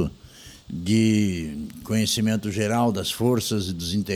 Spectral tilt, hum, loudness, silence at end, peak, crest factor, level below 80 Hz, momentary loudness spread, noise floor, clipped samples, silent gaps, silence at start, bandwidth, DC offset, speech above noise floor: -5 dB/octave; none; -24 LUFS; 0 s; -8 dBFS; 16 dB; -48 dBFS; 12 LU; -46 dBFS; under 0.1%; none; 0 s; 19 kHz; under 0.1%; 23 dB